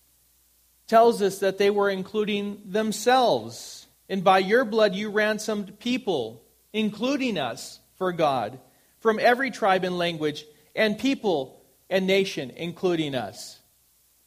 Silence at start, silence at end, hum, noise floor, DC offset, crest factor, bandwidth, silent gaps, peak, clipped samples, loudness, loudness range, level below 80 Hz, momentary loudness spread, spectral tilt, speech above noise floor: 0.9 s; 0.75 s; none; -63 dBFS; under 0.1%; 20 dB; 15.5 kHz; none; -6 dBFS; under 0.1%; -24 LUFS; 4 LU; -68 dBFS; 15 LU; -4.5 dB/octave; 39 dB